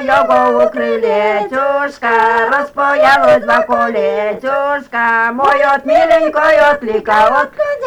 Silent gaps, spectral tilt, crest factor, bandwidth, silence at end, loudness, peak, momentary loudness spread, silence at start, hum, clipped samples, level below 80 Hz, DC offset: none; -4.5 dB/octave; 10 dB; 12.5 kHz; 0 s; -12 LUFS; -2 dBFS; 6 LU; 0 s; none; under 0.1%; -48 dBFS; under 0.1%